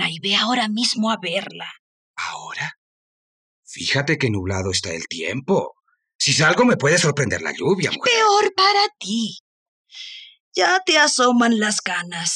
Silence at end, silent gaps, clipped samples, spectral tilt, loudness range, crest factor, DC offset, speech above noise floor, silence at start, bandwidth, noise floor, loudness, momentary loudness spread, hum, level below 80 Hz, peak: 0 s; 1.79-2.14 s, 2.77-3.63 s, 6.15-6.19 s, 9.40-9.85 s, 10.40-10.51 s; under 0.1%; -3 dB/octave; 8 LU; 18 dB; under 0.1%; over 71 dB; 0 s; 12 kHz; under -90 dBFS; -19 LUFS; 16 LU; none; -60 dBFS; -4 dBFS